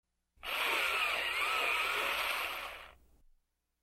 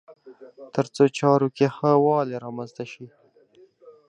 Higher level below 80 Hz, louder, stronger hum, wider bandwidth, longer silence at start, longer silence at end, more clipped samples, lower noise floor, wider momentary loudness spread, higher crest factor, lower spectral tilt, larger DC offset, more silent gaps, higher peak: first, -64 dBFS vs -70 dBFS; second, -32 LUFS vs -22 LUFS; neither; first, 16 kHz vs 9.8 kHz; first, 0.45 s vs 0.1 s; first, 0.9 s vs 0.2 s; neither; first, -74 dBFS vs -56 dBFS; second, 13 LU vs 17 LU; about the same, 16 dB vs 20 dB; second, 0 dB/octave vs -7 dB/octave; neither; neither; second, -20 dBFS vs -4 dBFS